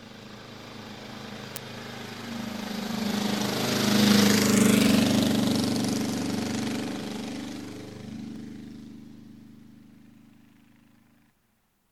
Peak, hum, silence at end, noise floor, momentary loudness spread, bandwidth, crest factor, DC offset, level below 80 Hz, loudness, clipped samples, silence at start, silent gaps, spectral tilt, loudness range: -6 dBFS; none; 2.1 s; -70 dBFS; 23 LU; over 20 kHz; 22 dB; 0.1%; -60 dBFS; -25 LUFS; under 0.1%; 0 s; none; -4 dB/octave; 20 LU